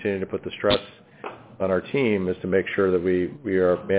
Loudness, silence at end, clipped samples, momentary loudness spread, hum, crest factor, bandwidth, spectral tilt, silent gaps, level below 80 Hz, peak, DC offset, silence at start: -24 LUFS; 0 s; under 0.1%; 14 LU; none; 16 dB; 4 kHz; -10 dB/octave; none; -50 dBFS; -8 dBFS; under 0.1%; 0 s